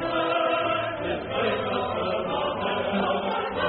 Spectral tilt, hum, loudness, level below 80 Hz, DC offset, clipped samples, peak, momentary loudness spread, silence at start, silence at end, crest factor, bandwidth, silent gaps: -2.5 dB/octave; none; -26 LUFS; -54 dBFS; under 0.1%; under 0.1%; -12 dBFS; 4 LU; 0 s; 0 s; 16 dB; 4.5 kHz; none